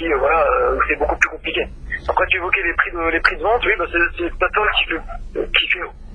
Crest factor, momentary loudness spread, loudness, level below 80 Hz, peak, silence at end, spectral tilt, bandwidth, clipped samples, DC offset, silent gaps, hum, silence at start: 18 dB; 7 LU; -18 LUFS; -32 dBFS; 0 dBFS; 0 s; -4 dB/octave; 10 kHz; under 0.1%; under 0.1%; none; none; 0 s